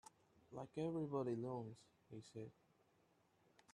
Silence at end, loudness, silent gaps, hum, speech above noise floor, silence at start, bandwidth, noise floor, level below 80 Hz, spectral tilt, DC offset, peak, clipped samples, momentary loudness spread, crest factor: 1.2 s; -48 LUFS; none; none; 31 dB; 0.5 s; 11.5 kHz; -78 dBFS; -84 dBFS; -8 dB/octave; under 0.1%; -30 dBFS; under 0.1%; 16 LU; 20 dB